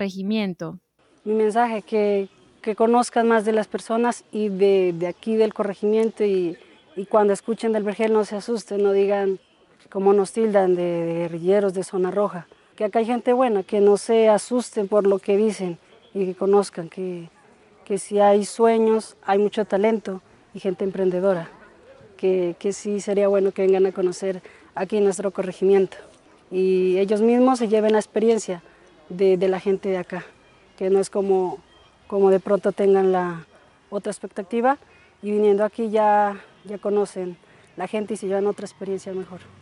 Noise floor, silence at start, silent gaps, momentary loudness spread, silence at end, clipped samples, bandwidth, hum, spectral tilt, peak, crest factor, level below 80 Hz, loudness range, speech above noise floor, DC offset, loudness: -53 dBFS; 0 s; none; 14 LU; 0.25 s; under 0.1%; 11.5 kHz; none; -6 dB/octave; -4 dBFS; 16 dB; -68 dBFS; 3 LU; 32 dB; under 0.1%; -21 LUFS